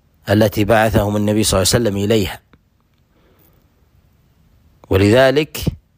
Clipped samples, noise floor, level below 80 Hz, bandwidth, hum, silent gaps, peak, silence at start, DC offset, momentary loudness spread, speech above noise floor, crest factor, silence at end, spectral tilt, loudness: under 0.1%; -58 dBFS; -36 dBFS; 15.5 kHz; none; none; -2 dBFS; 0.25 s; under 0.1%; 9 LU; 44 dB; 14 dB; 0.2 s; -5 dB/octave; -15 LUFS